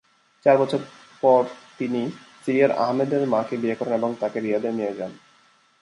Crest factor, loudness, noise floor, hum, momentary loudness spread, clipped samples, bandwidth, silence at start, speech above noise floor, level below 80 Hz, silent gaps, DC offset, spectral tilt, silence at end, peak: 20 dB; -23 LUFS; -59 dBFS; none; 12 LU; under 0.1%; 11 kHz; 0.45 s; 37 dB; -72 dBFS; none; under 0.1%; -7 dB/octave; 0.65 s; -4 dBFS